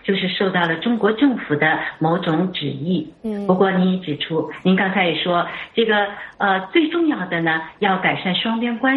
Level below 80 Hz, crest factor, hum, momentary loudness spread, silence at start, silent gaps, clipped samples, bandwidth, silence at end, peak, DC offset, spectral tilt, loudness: -60 dBFS; 16 dB; none; 6 LU; 0.05 s; none; under 0.1%; 4.5 kHz; 0 s; -2 dBFS; under 0.1%; -8.5 dB/octave; -19 LUFS